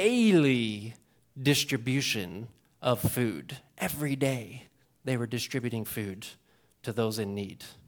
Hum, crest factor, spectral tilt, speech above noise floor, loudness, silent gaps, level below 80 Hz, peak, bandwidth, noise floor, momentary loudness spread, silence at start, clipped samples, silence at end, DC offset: none; 18 dB; -5 dB/octave; 20 dB; -29 LUFS; none; -62 dBFS; -12 dBFS; 19 kHz; -49 dBFS; 19 LU; 0 s; under 0.1%; 0.15 s; under 0.1%